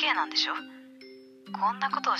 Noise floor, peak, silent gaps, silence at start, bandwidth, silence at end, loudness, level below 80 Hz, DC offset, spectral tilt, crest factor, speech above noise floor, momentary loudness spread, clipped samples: -50 dBFS; -12 dBFS; none; 0 s; 13.5 kHz; 0 s; -28 LUFS; -88 dBFS; under 0.1%; -2 dB/octave; 18 dB; 21 dB; 24 LU; under 0.1%